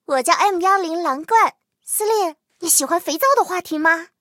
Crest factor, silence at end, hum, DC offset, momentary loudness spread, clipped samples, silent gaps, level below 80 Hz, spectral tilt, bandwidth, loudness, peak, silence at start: 18 dB; 0.15 s; none; under 0.1%; 7 LU; under 0.1%; none; -76 dBFS; 0 dB/octave; 16.5 kHz; -18 LUFS; 0 dBFS; 0.1 s